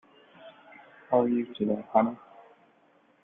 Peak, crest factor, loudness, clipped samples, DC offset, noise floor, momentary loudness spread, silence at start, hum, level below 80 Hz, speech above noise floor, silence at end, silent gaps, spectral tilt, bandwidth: -8 dBFS; 22 dB; -27 LUFS; under 0.1%; under 0.1%; -64 dBFS; 15 LU; 0.45 s; none; -74 dBFS; 38 dB; 1.05 s; none; -10 dB/octave; 3.8 kHz